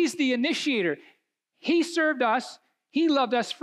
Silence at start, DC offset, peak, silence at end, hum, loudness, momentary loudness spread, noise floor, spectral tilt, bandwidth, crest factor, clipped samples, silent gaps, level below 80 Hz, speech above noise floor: 0 s; under 0.1%; -12 dBFS; 0.05 s; none; -25 LUFS; 9 LU; -72 dBFS; -3.5 dB/octave; 12.5 kHz; 14 dB; under 0.1%; none; -80 dBFS; 47 dB